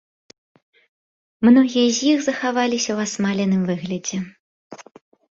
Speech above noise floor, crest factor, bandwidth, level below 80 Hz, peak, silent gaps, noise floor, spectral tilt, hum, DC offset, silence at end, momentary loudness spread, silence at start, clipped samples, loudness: over 72 dB; 18 dB; 7.8 kHz; -62 dBFS; -4 dBFS; 4.39-4.70 s; under -90 dBFS; -4.5 dB/octave; none; under 0.1%; 0.6 s; 11 LU; 1.4 s; under 0.1%; -19 LUFS